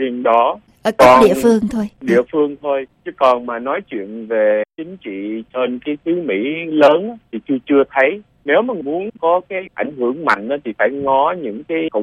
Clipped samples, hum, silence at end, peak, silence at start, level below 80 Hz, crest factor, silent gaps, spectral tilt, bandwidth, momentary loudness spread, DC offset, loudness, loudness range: under 0.1%; none; 0 s; 0 dBFS; 0 s; -52 dBFS; 16 dB; none; -5.5 dB/octave; 16 kHz; 13 LU; under 0.1%; -16 LUFS; 5 LU